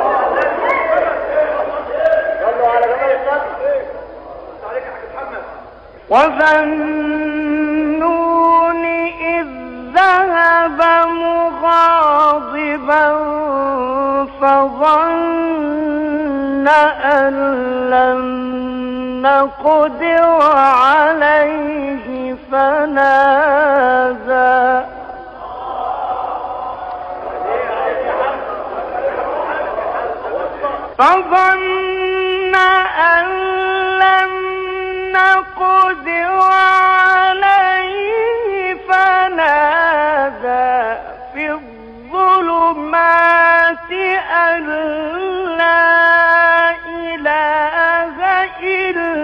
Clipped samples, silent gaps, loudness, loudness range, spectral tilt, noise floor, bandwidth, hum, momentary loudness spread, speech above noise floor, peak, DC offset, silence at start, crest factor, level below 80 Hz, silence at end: under 0.1%; none; -14 LUFS; 7 LU; -5 dB/octave; -37 dBFS; 9.8 kHz; none; 13 LU; 25 dB; -2 dBFS; under 0.1%; 0 s; 12 dB; -46 dBFS; 0 s